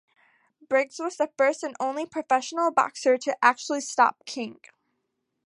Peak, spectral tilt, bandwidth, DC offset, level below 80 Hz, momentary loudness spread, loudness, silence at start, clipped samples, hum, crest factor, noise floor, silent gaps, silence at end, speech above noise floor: -4 dBFS; -2 dB/octave; 11.5 kHz; under 0.1%; -84 dBFS; 10 LU; -25 LUFS; 0.7 s; under 0.1%; none; 22 dB; -79 dBFS; none; 0.95 s; 54 dB